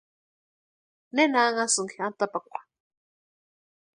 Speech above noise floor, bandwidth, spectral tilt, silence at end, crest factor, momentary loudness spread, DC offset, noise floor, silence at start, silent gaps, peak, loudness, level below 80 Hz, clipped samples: over 65 dB; 11.5 kHz; -2 dB/octave; 1.35 s; 22 dB; 16 LU; under 0.1%; under -90 dBFS; 1.15 s; none; -8 dBFS; -25 LUFS; -82 dBFS; under 0.1%